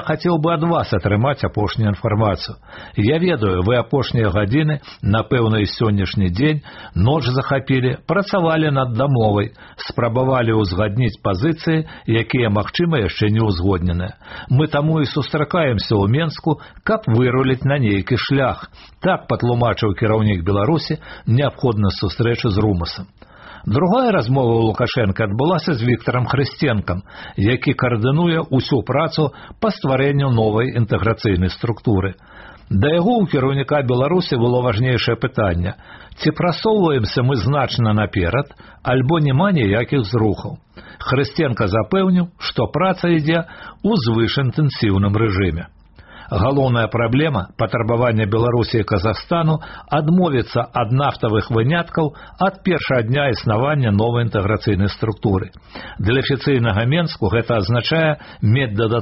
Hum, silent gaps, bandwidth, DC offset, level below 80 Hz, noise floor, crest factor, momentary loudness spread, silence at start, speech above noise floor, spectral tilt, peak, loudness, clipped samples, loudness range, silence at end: none; none; 6 kHz; under 0.1%; -40 dBFS; -42 dBFS; 12 dB; 6 LU; 0 s; 24 dB; -6 dB/octave; -4 dBFS; -18 LUFS; under 0.1%; 1 LU; 0 s